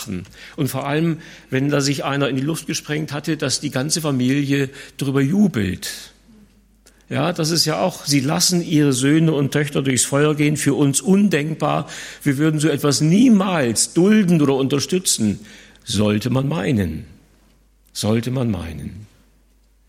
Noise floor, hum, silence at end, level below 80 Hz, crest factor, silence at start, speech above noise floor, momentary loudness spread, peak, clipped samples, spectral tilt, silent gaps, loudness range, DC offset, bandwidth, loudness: -56 dBFS; none; 0.85 s; -52 dBFS; 16 dB; 0 s; 37 dB; 11 LU; -4 dBFS; under 0.1%; -5 dB/octave; none; 6 LU; under 0.1%; 16.5 kHz; -18 LUFS